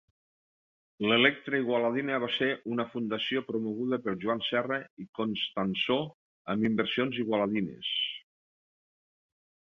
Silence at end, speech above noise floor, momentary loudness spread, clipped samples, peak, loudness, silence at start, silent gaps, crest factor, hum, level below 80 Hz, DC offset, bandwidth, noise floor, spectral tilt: 1.5 s; over 60 dB; 8 LU; under 0.1%; -8 dBFS; -30 LUFS; 1 s; 4.90-4.97 s, 5.09-5.13 s, 6.14-6.45 s; 24 dB; none; -70 dBFS; under 0.1%; 6.6 kHz; under -90 dBFS; -7 dB/octave